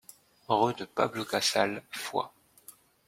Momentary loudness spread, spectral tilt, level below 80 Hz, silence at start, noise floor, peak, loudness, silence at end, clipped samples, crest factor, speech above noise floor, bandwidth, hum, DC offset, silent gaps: 8 LU; -3 dB/octave; -72 dBFS; 0.5 s; -56 dBFS; -10 dBFS; -30 LUFS; 0.35 s; under 0.1%; 22 dB; 26 dB; 16.5 kHz; none; under 0.1%; none